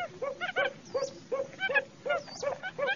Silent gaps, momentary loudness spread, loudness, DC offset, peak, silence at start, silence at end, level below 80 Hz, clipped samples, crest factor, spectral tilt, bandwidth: none; 7 LU; -33 LUFS; under 0.1%; -14 dBFS; 0 s; 0 s; -72 dBFS; under 0.1%; 20 dB; -2.5 dB/octave; 7.4 kHz